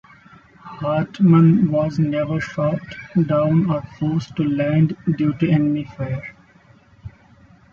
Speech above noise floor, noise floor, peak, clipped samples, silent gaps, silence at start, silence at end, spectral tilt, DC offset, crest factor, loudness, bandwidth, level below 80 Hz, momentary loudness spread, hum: 33 dB; -51 dBFS; -4 dBFS; under 0.1%; none; 0.65 s; 0.65 s; -9.5 dB/octave; under 0.1%; 16 dB; -19 LUFS; 6.8 kHz; -52 dBFS; 13 LU; none